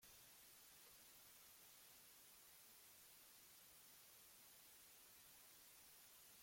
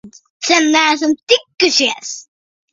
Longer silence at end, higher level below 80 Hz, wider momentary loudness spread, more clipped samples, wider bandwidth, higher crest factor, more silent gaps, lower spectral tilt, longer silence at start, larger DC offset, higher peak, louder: second, 0 s vs 0.5 s; second, under -90 dBFS vs -62 dBFS; second, 0 LU vs 13 LU; neither; first, 16.5 kHz vs 7.8 kHz; about the same, 14 dB vs 16 dB; second, none vs 0.30-0.40 s, 1.23-1.27 s; about the same, 0 dB/octave vs -0.5 dB/octave; about the same, 0 s vs 0.05 s; neither; second, -54 dBFS vs 0 dBFS; second, -64 LUFS vs -13 LUFS